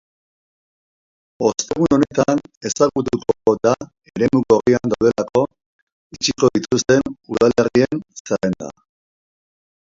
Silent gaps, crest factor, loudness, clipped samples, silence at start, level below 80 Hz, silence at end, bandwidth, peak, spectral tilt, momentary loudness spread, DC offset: 2.57-2.61 s, 5.66-6.10 s, 8.20-8.25 s; 18 dB; -18 LUFS; under 0.1%; 1.4 s; -50 dBFS; 1.2 s; 7.8 kHz; -2 dBFS; -5 dB/octave; 10 LU; under 0.1%